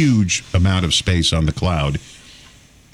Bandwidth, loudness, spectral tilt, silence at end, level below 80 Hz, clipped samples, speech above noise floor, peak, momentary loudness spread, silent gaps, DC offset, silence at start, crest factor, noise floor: 12 kHz; -17 LUFS; -4.5 dB/octave; 0.8 s; -34 dBFS; under 0.1%; 30 dB; -6 dBFS; 6 LU; none; under 0.1%; 0 s; 12 dB; -47 dBFS